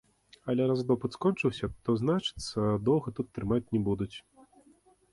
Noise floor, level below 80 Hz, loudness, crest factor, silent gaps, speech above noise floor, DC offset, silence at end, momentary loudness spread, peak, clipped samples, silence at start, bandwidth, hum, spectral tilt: -63 dBFS; -54 dBFS; -30 LUFS; 16 dB; none; 34 dB; under 0.1%; 0.95 s; 8 LU; -14 dBFS; under 0.1%; 0.45 s; 11.5 kHz; none; -7 dB/octave